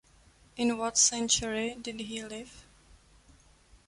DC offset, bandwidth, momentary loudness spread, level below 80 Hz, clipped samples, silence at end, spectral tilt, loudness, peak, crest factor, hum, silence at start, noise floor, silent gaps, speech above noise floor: under 0.1%; 11.5 kHz; 20 LU; -58 dBFS; under 0.1%; 1.25 s; -1 dB/octave; -28 LUFS; -12 dBFS; 22 dB; none; 0.55 s; -61 dBFS; none; 30 dB